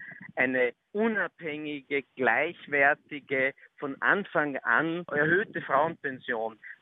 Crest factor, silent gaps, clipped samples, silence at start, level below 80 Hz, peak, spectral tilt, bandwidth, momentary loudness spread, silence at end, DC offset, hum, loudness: 20 dB; none; under 0.1%; 0 s; -78 dBFS; -10 dBFS; -8.5 dB/octave; 4 kHz; 10 LU; 0.1 s; under 0.1%; none; -28 LUFS